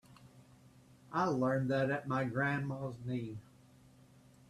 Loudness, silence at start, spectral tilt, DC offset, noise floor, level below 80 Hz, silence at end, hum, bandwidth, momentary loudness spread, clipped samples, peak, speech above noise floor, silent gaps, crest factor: -36 LUFS; 0.1 s; -7.5 dB/octave; under 0.1%; -62 dBFS; -70 dBFS; 1.1 s; none; 12.5 kHz; 9 LU; under 0.1%; -20 dBFS; 27 dB; none; 18 dB